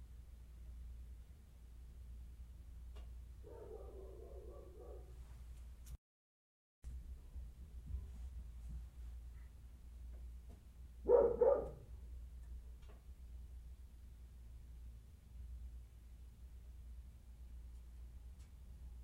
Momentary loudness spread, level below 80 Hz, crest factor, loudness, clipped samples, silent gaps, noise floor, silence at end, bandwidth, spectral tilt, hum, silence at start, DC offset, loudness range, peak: 9 LU; -54 dBFS; 28 dB; -44 LUFS; under 0.1%; 5.98-6.82 s; under -90 dBFS; 0 s; 15.5 kHz; -8 dB/octave; none; 0 s; under 0.1%; 18 LU; -20 dBFS